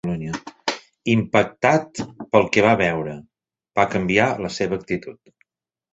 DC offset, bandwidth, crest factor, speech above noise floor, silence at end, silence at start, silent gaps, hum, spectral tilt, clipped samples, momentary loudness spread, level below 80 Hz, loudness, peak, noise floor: under 0.1%; 8.2 kHz; 20 dB; 47 dB; 0.8 s; 0.05 s; none; none; -5.5 dB/octave; under 0.1%; 14 LU; -52 dBFS; -21 LUFS; -2 dBFS; -66 dBFS